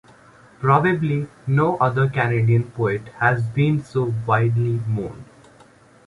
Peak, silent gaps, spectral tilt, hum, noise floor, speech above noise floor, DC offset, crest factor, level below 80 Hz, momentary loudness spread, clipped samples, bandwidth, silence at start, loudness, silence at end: -2 dBFS; none; -8.5 dB/octave; none; -51 dBFS; 31 dB; under 0.1%; 18 dB; -52 dBFS; 7 LU; under 0.1%; 11 kHz; 0.6 s; -20 LUFS; 0.85 s